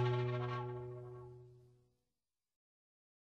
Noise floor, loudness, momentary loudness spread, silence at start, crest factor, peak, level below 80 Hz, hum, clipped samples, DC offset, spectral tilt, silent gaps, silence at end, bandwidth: under -90 dBFS; -42 LUFS; 21 LU; 0 s; 18 dB; -26 dBFS; -72 dBFS; none; under 0.1%; under 0.1%; -8.5 dB/octave; none; 1.7 s; 6.4 kHz